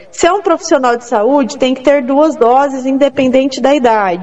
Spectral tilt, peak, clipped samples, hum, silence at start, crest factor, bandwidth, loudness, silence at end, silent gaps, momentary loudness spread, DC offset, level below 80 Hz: -4 dB/octave; 0 dBFS; 0.4%; none; 0.15 s; 10 dB; 8.2 kHz; -11 LUFS; 0 s; none; 3 LU; 0.9%; -48 dBFS